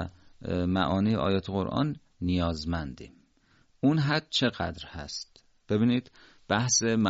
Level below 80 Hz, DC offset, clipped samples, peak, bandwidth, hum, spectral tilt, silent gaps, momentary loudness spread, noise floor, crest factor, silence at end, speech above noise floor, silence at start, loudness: -54 dBFS; under 0.1%; under 0.1%; -10 dBFS; 8 kHz; none; -5 dB/octave; none; 14 LU; -65 dBFS; 20 dB; 0 s; 37 dB; 0 s; -28 LUFS